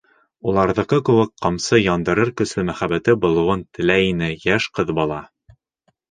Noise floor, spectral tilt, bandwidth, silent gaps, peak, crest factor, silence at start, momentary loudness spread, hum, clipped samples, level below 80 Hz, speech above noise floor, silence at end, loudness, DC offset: -67 dBFS; -5.5 dB/octave; 9.6 kHz; none; 0 dBFS; 18 dB; 0.45 s; 6 LU; none; under 0.1%; -44 dBFS; 49 dB; 0.85 s; -19 LUFS; under 0.1%